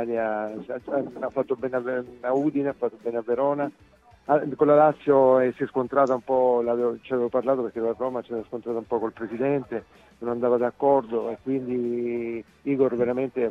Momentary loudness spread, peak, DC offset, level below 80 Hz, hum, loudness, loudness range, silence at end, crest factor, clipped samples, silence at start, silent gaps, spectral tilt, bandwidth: 12 LU; -6 dBFS; under 0.1%; -64 dBFS; none; -25 LUFS; 6 LU; 0 s; 18 dB; under 0.1%; 0 s; none; -9 dB/octave; 7.2 kHz